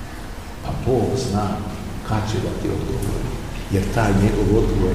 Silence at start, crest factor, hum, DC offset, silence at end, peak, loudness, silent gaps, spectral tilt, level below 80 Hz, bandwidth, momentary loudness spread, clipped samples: 0 s; 16 dB; none; 1%; 0 s; -6 dBFS; -22 LUFS; none; -6.5 dB/octave; -28 dBFS; 15.5 kHz; 12 LU; under 0.1%